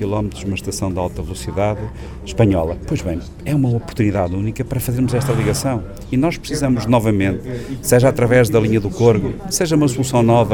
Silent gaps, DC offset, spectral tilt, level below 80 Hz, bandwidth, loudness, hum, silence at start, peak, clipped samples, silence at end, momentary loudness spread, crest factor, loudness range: none; under 0.1%; -6 dB/octave; -34 dBFS; 19.5 kHz; -18 LUFS; none; 0 s; -2 dBFS; under 0.1%; 0 s; 11 LU; 16 dB; 5 LU